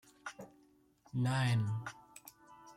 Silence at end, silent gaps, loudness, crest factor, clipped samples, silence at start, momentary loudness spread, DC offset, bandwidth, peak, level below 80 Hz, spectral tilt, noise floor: 0.05 s; none; -36 LUFS; 16 dB; under 0.1%; 0.25 s; 24 LU; under 0.1%; 14.5 kHz; -24 dBFS; -70 dBFS; -6 dB/octave; -68 dBFS